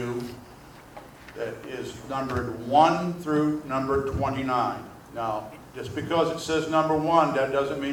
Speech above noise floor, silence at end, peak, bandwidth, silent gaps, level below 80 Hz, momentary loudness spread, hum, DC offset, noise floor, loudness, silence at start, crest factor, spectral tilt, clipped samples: 22 dB; 0 s; -6 dBFS; 20 kHz; none; -50 dBFS; 18 LU; none; under 0.1%; -47 dBFS; -26 LUFS; 0 s; 20 dB; -6 dB/octave; under 0.1%